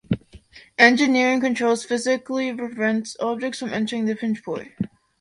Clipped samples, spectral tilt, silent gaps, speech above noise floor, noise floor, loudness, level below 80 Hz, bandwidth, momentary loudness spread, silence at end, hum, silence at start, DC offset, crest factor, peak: under 0.1%; -4.5 dB/octave; none; 26 dB; -48 dBFS; -22 LUFS; -56 dBFS; 11 kHz; 15 LU; 0.35 s; none; 0.1 s; under 0.1%; 22 dB; -2 dBFS